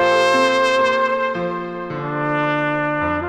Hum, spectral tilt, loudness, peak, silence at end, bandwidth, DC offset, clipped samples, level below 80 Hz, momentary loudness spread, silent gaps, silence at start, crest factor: none; -5 dB/octave; -18 LUFS; -2 dBFS; 0 s; 12 kHz; under 0.1%; under 0.1%; -52 dBFS; 10 LU; none; 0 s; 16 dB